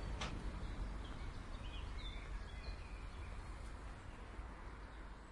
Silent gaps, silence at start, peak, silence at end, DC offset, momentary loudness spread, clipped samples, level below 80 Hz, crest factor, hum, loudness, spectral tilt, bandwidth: none; 0 s; -32 dBFS; 0 s; under 0.1%; 7 LU; under 0.1%; -48 dBFS; 16 dB; none; -51 LUFS; -5 dB/octave; 11.5 kHz